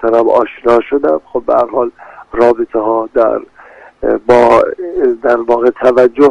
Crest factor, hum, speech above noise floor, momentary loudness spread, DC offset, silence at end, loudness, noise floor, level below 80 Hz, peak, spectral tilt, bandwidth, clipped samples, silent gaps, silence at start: 12 dB; none; 28 dB; 8 LU; under 0.1%; 0 s; -12 LUFS; -38 dBFS; -42 dBFS; 0 dBFS; -6.5 dB/octave; 9.4 kHz; 0.3%; none; 0 s